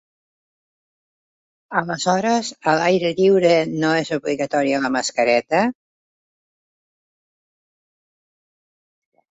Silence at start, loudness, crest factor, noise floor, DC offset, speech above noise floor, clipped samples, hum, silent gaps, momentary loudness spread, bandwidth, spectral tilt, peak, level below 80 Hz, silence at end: 1.7 s; -19 LUFS; 18 dB; under -90 dBFS; under 0.1%; over 72 dB; under 0.1%; none; none; 7 LU; 8.2 kHz; -4.5 dB/octave; -4 dBFS; -64 dBFS; 3.6 s